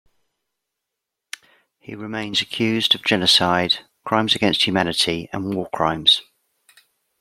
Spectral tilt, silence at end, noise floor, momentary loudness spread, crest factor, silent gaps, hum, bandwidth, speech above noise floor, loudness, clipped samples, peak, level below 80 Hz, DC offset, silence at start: -3.5 dB/octave; 1 s; -82 dBFS; 20 LU; 22 dB; none; none; 15.5 kHz; 62 dB; -18 LUFS; under 0.1%; -2 dBFS; -58 dBFS; under 0.1%; 1.9 s